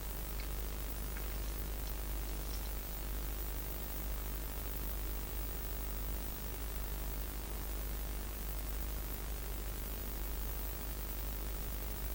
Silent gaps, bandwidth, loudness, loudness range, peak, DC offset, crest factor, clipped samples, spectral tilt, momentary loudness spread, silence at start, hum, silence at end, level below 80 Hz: none; 17 kHz; -41 LUFS; 1 LU; -26 dBFS; under 0.1%; 14 dB; under 0.1%; -4 dB/octave; 1 LU; 0 s; none; 0 s; -42 dBFS